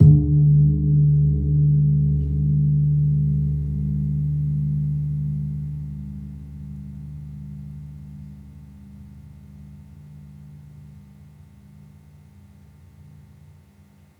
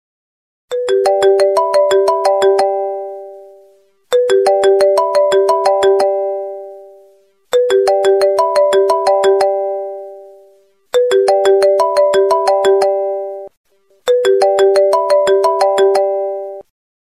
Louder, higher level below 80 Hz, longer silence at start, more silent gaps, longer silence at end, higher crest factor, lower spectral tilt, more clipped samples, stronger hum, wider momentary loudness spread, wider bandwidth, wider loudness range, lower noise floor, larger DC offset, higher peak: second, -20 LUFS vs -13 LUFS; first, -36 dBFS vs -60 dBFS; second, 0 s vs 0.7 s; second, none vs 13.57-13.64 s; first, 3.2 s vs 0.4 s; first, 20 dB vs 12 dB; first, -13 dB/octave vs -2.5 dB/octave; neither; neither; first, 26 LU vs 13 LU; second, 0.9 kHz vs 13.5 kHz; first, 25 LU vs 1 LU; about the same, -52 dBFS vs -50 dBFS; neither; about the same, -2 dBFS vs 0 dBFS